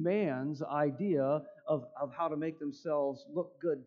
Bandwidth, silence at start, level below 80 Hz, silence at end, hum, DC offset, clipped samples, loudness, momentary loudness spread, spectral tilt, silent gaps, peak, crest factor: 7 kHz; 0 s; -84 dBFS; 0.05 s; none; under 0.1%; under 0.1%; -35 LUFS; 7 LU; -9 dB/octave; none; -20 dBFS; 14 dB